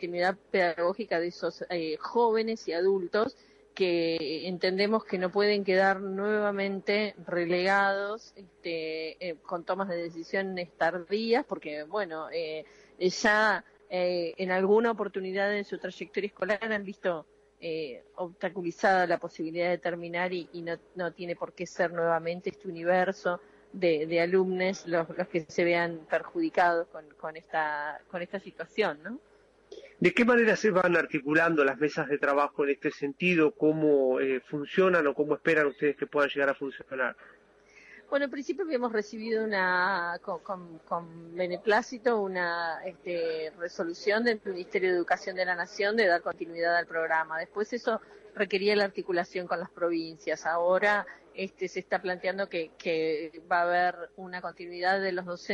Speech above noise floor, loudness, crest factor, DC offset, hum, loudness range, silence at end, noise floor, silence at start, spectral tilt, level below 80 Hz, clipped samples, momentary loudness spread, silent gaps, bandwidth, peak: 29 dB; -29 LUFS; 18 dB; under 0.1%; none; 6 LU; 0 s; -58 dBFS; 0 s; -5.5 dB/octave; -72 dBFS; under 0.1%; 12 LU; none; 10 kHz; -12 dBFS